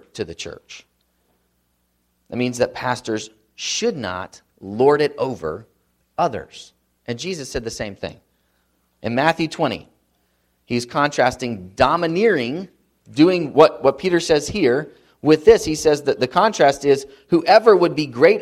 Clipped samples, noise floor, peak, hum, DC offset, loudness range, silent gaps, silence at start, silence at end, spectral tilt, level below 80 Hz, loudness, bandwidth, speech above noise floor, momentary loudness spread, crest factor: under 0.1%; -67 dBFS; 0 dBFS; 60 Hz at -55 dBFS; under 0.1%; 11 LU; none; 0.15 s; 0 s; -5 dB/octave; -50 dBFS; -18 LUFS; 13.5 kHz; 49 dB; 18 LU; 20 dB